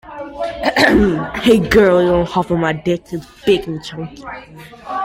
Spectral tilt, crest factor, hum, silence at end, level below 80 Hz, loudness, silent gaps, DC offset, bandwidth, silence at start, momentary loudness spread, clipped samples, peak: -6 dB/octave; 16 dB; none; 0 s; -36 dBFS; -15 LUFS; none; under 0.1%; 16.5 kHz; 0.05 s; 19 LU; under 0.1%; 0 dBFS